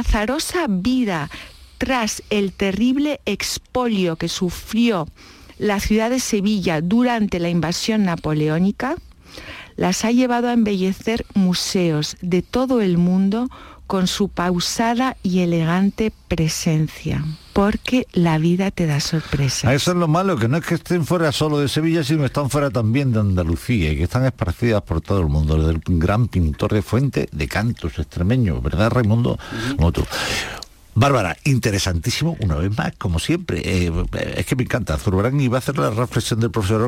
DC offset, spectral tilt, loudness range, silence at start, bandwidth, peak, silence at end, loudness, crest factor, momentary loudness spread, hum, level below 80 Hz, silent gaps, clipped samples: under 0.1%; -5.5 dB/octave; 2 LU; 0 s; 16.5 kHz; -6 dBFS; 0 s; -20 LUFS; 12 dB; 6 LU; none; -34 dBFS; none; under 0.1%